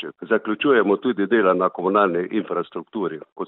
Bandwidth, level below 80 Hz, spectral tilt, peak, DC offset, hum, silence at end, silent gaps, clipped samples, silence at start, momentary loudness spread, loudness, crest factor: 4.1 kHz; -68 dBFS; -10.5 dB/octave; -4 dBFS; under 0.1%; none; 0 s; 3.32-3.36 s; under 0.1%; 0 s; 10 LU; -21 LUFS; 18 dB